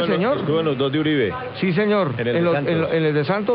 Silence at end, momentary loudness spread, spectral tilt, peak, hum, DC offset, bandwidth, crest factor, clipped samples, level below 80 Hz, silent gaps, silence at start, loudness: 0 s; 2 LU; -11.5 dB/octave; -8 dBFS; none; under 0.1%; 5.4 kHz; 12 dB; under 0.1%; -52 dBFS; none; 0 s; -20 LUFS